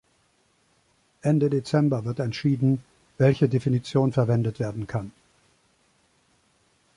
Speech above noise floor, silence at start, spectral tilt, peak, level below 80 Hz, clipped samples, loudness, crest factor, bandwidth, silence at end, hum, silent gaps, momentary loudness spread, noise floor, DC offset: 43 dB; 1.25 s; -8 dB/octave; -8 dBFS; -58 dBFS; under 0.1%; -24 LUFS; 18 dB; 11 kHz; 1.85 s; none; none; 9 LU; -66 dBFS; under 0.1%